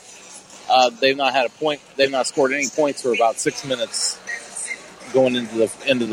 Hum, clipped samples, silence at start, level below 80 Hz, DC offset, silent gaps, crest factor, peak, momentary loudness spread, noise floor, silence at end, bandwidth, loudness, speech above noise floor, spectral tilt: none; under 0.1%; 0.05 s; -66 dBFS; under 0.1%; none; 16 dB; -6 dBFS; 12 LU; -42 dBFS; 0 s; 16.5 kHz; -20 LUFS; 22 dB; -2.5 dB/octave